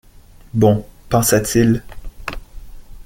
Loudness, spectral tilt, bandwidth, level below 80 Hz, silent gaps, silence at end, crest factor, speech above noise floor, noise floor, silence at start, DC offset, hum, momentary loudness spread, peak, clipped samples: -16 LUFS; -5.5 dB/octave; 17 kHz; -36 dBFS; none; 0.05 s; 18 dB; 29 dB; -43 dBFS; 0.55 s; under 0.1%; none; 16 LU; -2 dBFS; under 0.1%